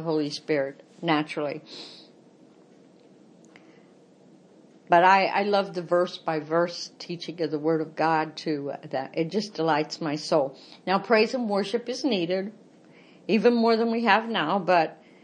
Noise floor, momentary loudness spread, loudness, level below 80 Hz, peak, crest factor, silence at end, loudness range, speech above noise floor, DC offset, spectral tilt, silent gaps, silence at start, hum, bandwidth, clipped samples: -55 dBFS; 12 LU; -25 LUFS; -82 dBFS; -4 dBFS; 22 dB; 0.3 s; 7 LU; 30 dB; under 0.1%; -5.5 dB/octave; none; 0 s; none; 10 kHz; under 0.1%